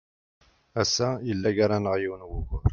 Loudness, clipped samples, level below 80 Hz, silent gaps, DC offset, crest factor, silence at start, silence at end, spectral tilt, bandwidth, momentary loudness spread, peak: -27 LUFS; under 0.1%; -40 dBFS; none; under 0.1%; 18 dB; 0.75 s; 0 s; -5 dB/octave; 7.4 kHz; 11 LU; -10 dBFS